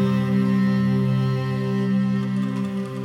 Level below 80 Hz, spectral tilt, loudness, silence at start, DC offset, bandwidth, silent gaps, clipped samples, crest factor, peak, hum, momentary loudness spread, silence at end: -60 dBFS; -8.5 dB/octave; -22 LUFS; 0 s; under 0.1%; 10.5 kHz; none; under 0.1%; 10 dB; -10 dBFS; none; 5 LU; 0 s